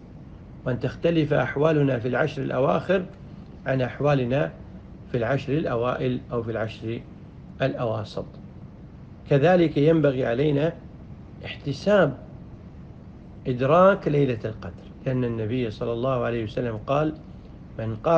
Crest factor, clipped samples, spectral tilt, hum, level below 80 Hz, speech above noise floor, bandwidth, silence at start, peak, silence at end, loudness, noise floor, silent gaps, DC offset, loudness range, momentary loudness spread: 20 dB; under 0.1%; -8.5 dB/octave; none; -48 dBFS; 20 dB; 7.4 kHz; 0 s; -4 dBFS; 0 s; -24 LUFS; -43 dBFS; none; under 0.1%; 5 LU; 24 LU